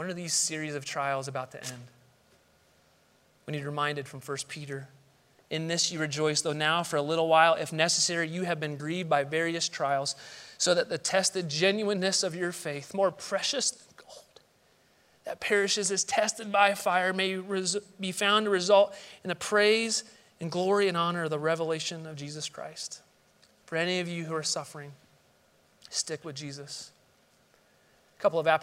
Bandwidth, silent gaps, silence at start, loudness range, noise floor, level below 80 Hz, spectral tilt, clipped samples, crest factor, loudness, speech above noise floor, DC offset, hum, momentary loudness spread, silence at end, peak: 16 kHz; none; 0 s; 11 LU; -65 dBFS; -78 dBFS; -3 dB/octave; under 0.1%; 24 dB; -28 LUFS; 36 dB; under 0.1%; none; 16 LU; 0 s; -8 dBFS